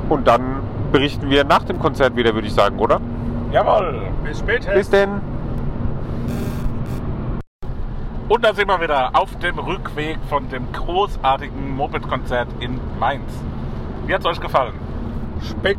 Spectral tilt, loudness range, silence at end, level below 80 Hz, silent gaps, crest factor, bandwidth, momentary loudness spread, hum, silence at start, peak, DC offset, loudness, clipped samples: -6.5 dB/octave; 6 LU; 0 s; -28 dBFS; 7.47-7.59 s; 18 dB; 16 kHz; 12 LU; none; 0 s; -2 dBFS; under 0.1%; -20 LUFS; under 0.1%